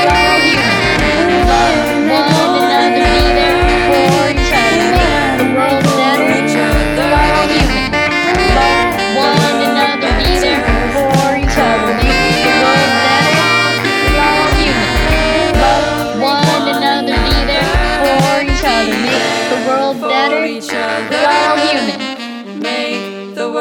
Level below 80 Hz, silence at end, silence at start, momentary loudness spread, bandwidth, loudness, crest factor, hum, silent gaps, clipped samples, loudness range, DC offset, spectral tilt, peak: -22 dBFS; 0 s; 0 s; 5 LU; over 20 kHz; -11 LUFS; 12 dB; none; none; under 0.1%; 3 LU; under 0.1%; -4.5 dB/octave; 0 dBFS